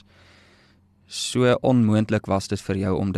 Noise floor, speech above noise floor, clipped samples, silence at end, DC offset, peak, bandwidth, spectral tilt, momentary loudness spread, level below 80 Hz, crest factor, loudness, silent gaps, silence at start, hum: -57 dBFS; 37 dB; under 0.1%; 0 s; under 0.1%; -6 dBFS; 13 kHz; -6 dB/octave; 9 LU; -54 dBFS; 16 dB; -22 LUFS; none; 1.1 s; none